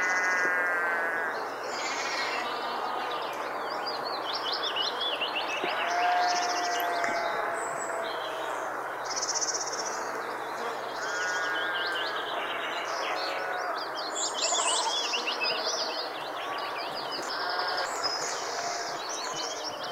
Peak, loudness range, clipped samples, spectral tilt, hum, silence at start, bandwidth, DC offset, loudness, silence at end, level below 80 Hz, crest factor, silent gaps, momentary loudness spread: -14 dBFS; 3 LU; under 0.1%; 0 dB/octave; none; 0 s; 16 kHz; under 0.1%; -30 LUFS; 0 s; -74 dBFS; 18 dB; none; 7 LU